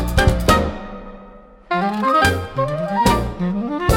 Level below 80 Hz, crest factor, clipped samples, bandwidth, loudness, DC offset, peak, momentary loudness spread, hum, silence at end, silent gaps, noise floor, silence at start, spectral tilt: -28 dBFS; 18 dB; under 0.1%; 18 kHz; -18 LUFS; under 0.1%; 0 dBFS; 16 LU; none; 0 s; none; -42 dBFS; 0 s; -5.5 dB/octave